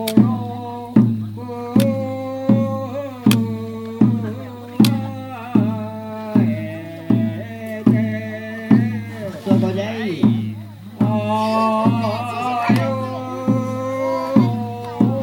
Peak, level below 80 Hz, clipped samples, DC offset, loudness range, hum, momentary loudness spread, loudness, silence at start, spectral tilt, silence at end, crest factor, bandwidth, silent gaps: 0 dBFS; -60 dBFS; under 0.1%; under 0.1%; 1 LU; none; 12 LU; -20 LUFS; 0 s; -7.5 dB/octave; 0 s; 18 dB; 17.5 kHz; none